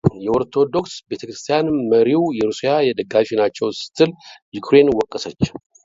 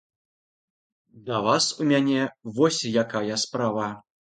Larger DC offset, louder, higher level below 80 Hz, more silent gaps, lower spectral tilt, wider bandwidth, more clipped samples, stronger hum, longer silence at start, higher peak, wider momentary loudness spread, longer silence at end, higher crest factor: neither; first, -18 LUFS vs -24 LUFS; first, -50 dBFS vs -68 dBFS; first, 4.42-4.52 s vs none; first, -6 dB/octave vs -4 dB/octave; second, 7.8 kHz vs 9.4 kHz; neither; neither; second, 0.05 s vs 1.15 s; first, 0 dBFS vs -6 dBFS; first, 13 LU vs 9 LU; about the same, 0.25 s vs 0.3 s; about the same, 18 dB vs 20 dB